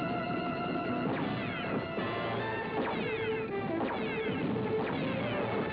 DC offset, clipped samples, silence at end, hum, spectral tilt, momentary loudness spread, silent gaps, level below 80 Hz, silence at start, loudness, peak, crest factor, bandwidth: under 0.1%; under 0.1%; 0 s; none; -9 dB/octave; 2 LU; none; -60 dBFS; 0 s; -33 LUFS; -20 dBFS; 12 dB; 5.4 kHz